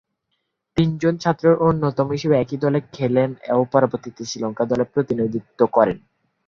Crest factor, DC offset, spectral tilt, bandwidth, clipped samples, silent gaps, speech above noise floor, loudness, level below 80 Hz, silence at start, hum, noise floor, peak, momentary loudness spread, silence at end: 18 dB; under 0.1%; -7 dB/octave; 7.4 kHz; under 0.1%; none; 55 dB; -20 LUFS; -54 dBFS; 0.75 s; none; -74 dBFS; -2 dBFS; 9 LU; 0.5 s